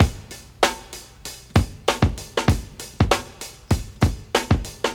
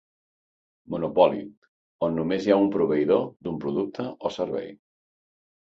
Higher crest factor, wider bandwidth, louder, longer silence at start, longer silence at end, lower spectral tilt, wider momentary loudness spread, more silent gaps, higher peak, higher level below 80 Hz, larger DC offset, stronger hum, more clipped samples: about the same, 22 dB vs 20 dB; first, 18.5 kHz vs 7.6 kHz; about the same, -23 LUFS vs -25 LUFS; second, 0 s vs 0.9 s; second, 0 s vs 0.9 s; second, -5 dB/octave vs -7.5 dB/octave; about the same, 15 LU vs 13 LU; second, none vs 1.57-1.62 s, 1.68-1.99 s; first, 0 dBFS vs -6 dBFS; first, -32 dBFS vs -62 dBFS; neither; neither; neither